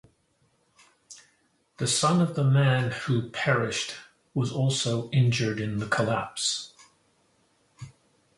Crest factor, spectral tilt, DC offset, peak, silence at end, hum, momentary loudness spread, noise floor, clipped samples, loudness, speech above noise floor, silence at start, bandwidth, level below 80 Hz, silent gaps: 18 dB; -4.5 dB/octave; under 0.1%; -8 dBFS; 0.45 s; none; 16 LU; -69 dBFS; under 0.1%; -26 LUFS; 43 dB; 1.1 s; 11.5 kHz; -60 dBFS; none